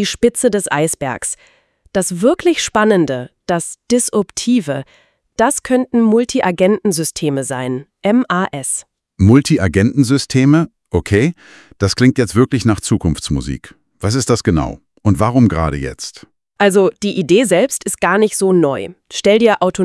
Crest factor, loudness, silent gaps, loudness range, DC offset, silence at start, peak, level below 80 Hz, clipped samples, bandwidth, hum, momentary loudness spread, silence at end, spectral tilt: 14 dB; -15 LUFS; none; 3 LU; under 0.1%; 0 s; 0 dBFS; -40 dBFS; under 0.1%; 12 kHz; none; 10 LU; 0 s; -5 dB/octave